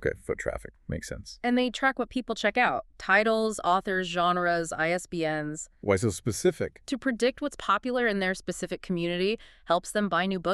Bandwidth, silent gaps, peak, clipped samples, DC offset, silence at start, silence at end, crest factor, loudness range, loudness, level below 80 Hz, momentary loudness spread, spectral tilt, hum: 13.5 kHz; none; -8 dBFS; under 0.1%; under 0.1%; 0 s; 0 s; 20 dB; 3 LU; -28 LUFS; -52 dBFS; 10 LU; -4.5 dB/octave; none